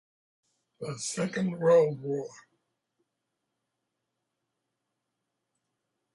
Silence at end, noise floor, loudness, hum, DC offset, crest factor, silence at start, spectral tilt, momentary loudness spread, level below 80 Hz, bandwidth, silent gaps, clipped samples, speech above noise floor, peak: 3.85 s; -84 dBFS; -28 LUFS; none; under 0.1%; 20 dB; 0.8 s; -5.5 dB/octave; 18 LU; -78 dBFS; 11.5 kHz; none; under 0.1%; 56 dB; -12 dBFS